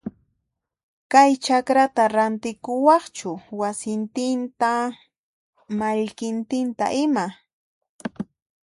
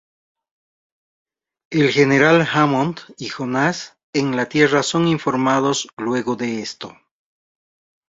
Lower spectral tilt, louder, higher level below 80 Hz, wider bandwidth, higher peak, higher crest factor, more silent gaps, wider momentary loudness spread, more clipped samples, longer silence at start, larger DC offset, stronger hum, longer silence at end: about the same, -4.5 dB/octave vs -5 dB/octave; second, -22 LUFS vs -18 LUFS; second, -68 dBFS vs -60 dBFS; first, 11.5 kHz vs 8 kHz; about the same, -4 dBFS vs -2 dBFS; about the same, 20 dB vs 18 dB; first, 0.83-1.10 s, 5.18-5.53 s, 7.53-7.81 s, 7.89-7.99 s vs 4.03-4.13 s, 5.93-5.97 s; about the same, 15 LU vs 15 LU; neither; second, 0.05 s vs 1.7 s; neither; neither; second, 0.4 s vs 1.2 s